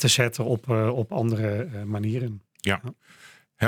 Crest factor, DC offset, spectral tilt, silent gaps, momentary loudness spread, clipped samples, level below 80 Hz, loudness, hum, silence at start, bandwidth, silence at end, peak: 20 dB; under 0.1%; -4.5 dB/octave; none; 8 LU; under 0.1%; -60 dBFS; -26 LUFS; none; 0 s; 18 kHz; 0 s; -4 dBFS